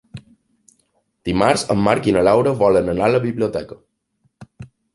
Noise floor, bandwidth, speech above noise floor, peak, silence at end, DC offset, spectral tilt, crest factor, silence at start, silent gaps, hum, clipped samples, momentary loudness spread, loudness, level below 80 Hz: -66 dBFS; 11.5 kHz; 50 dB; -2 dBFS; 0.3 s; under 0.1%; -6 dB/octave; 18 dB; 0.15 s; none; none; under 0.1%; 10 LU; -17 LUFS; -46 dBFS